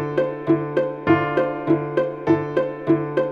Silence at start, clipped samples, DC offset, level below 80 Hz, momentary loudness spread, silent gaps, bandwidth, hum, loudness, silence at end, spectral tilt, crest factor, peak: 0 s; under 0.1%; under 0.1%; -56 dBFS; 4 LU; none; 5.8 kHz; none; -21 LUFS; 0 s; -9 dB/octave; 16 dB; -4 dBFS